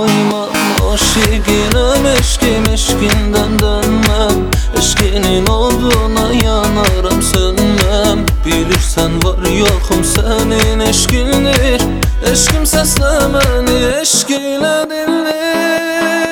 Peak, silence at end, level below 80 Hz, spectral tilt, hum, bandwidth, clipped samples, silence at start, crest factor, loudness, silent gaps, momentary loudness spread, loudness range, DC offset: 0 dBFS; 0 s; -18 dBFS; -4 dB/octave; none; over 20 kHz; under 0.1%; 0 s; 12 dB; -12 LUFS; none; 3 LU; 1 LU; under 0.1%